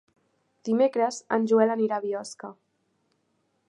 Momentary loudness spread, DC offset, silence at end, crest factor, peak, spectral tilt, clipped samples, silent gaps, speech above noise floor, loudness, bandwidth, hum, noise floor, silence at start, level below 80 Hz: 18 LU; under 0.1%; 1.15 s; 20 dB; -8 dBFS; -5.5 dB/octave; under 0.1%; none; 48 dB; -25 LUFS; 11 kHz; none; -73 dBFS; 0.65 s; -84 dBFS